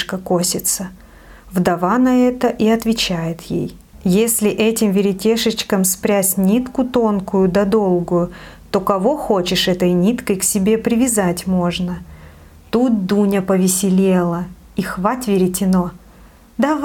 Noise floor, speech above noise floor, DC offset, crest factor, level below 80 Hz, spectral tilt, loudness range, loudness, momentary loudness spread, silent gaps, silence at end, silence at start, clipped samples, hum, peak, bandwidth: -44 dBFS; 28 dB; under 0.1%; 16 dB; -44 dBFS; -5 dB/octave; 2 LU; -17 LUFS; 9 LU; none; 0 s; 0 s; under 0.1%; none; -2 dBFS; 18 kHz